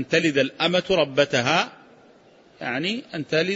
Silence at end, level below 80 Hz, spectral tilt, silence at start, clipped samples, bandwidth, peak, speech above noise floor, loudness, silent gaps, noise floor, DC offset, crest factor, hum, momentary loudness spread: 0 s; -60 dBFS; -4.5 dB/octave; 0 s; under 0.1%; 8 kHz; -4 dBFS; 31 dB; -22 LUFS; none; -53 dBFS; under 0.1%; 18 dB; none; 10 LU